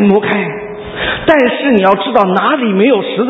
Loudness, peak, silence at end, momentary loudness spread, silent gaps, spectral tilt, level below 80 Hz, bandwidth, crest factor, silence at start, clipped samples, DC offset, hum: -11 LUFS; 0 dBFS; 0 s; 9 LU; none; -8 dB/octave; -42 dBFS; 5.4 kHz; 12 dB; 0 s; 0.2%; under 0.1%; none